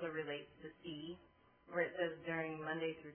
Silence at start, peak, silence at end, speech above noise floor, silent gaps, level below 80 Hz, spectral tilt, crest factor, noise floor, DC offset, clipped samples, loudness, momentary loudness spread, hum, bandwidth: 0 s; -26 dBFS; 0 s; 26 dB; none; -78 dBFS; -2 dB/octave; 20 dB; -69 dBFS; under 0.1%; under 0.1%; -43 LUFS; 13 LU; none; 3.3 kHz